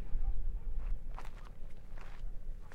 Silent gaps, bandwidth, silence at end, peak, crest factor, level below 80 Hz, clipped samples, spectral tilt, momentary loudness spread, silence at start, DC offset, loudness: none; 3.1 kHz; 0 s; -20 dBFS; 14 dB; -38 dBFS; under 0.1%; -7 dB/octave; 11 LU; 0 s; under 0.1%; -47 LUFS